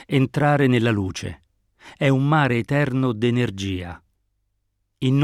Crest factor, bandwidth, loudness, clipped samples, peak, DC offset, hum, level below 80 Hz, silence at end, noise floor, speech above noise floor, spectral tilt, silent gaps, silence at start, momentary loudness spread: 16 dB; 12 kHz; -21 LUFS; under 0.1%; -6 dBFS; under 0.1%; none; -52 dBFS; 0 s; -72 dBFS; 52 dB; -7 dB/octave; none; 0 s; 12 LU